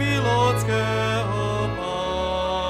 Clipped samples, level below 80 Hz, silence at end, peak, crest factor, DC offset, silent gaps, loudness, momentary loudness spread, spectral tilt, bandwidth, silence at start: under 0.1%; -40 dBFS; 0 s; -8 dBFS; 14 dB; under 0.1%; none; -23 LUFS; 6 LU; -5.5 dB/octave; 14.5 kHz; 0 s